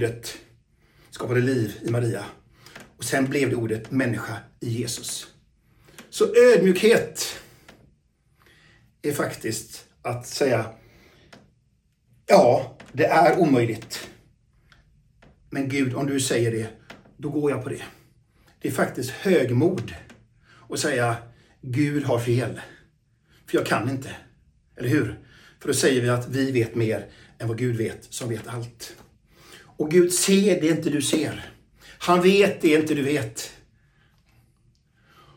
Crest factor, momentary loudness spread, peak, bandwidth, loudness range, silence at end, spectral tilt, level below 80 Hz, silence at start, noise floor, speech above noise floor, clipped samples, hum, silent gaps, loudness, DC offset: 22 dB; 18 LU; -2 dBFS; 17.5 kHz; 7 LU; 1.85 s; -5 dB/octave; -58 dBFS; 0 s; -66 dBFS; 43 dB; under 0.1%; none; none; -23 LUFS; under 0.1%